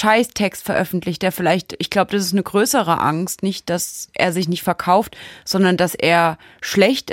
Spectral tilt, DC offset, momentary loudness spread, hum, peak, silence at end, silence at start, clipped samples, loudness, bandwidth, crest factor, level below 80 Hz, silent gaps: -4.5 dB/octave; under 0.1%; 7 LU; none; -2 dBFS; 0 s; 0 s; under 0.1%; -18 LUFS; 17 kHz; 16 dB; -54 dBFS; none